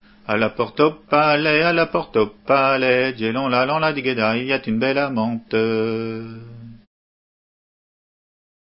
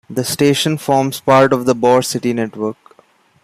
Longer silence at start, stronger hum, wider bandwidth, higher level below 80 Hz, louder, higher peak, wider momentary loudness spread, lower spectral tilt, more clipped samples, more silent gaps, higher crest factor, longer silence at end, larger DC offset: first, 0.3 s vs 0.1 s; neither; second, 5.8 kHz vs 15.5 kHz; about the same, -56 dBFS vs -56 dBFS; second, -19 LUFS vs -15 LUFS; about the same, -2 dBFS vs 0 dBFS; about the same, 8 LU vs 9 LU; first, -10 dB/octave vs -5 dB/octave; neither; neither; first, 20 dB vs 14 dB; first, 1.95 s vs 0.7 s; neither